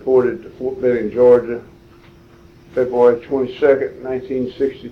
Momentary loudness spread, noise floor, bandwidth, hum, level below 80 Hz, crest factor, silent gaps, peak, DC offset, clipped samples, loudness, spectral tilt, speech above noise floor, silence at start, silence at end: 14 LU; -45 dBFS; 6 kHz; none; -50 dBFS; 16 dB; none; -2 dBFS; under 0.1%; under 0.1%; -17 LUFS; -8 dB/octave; 29 dB; 0 s; 0 s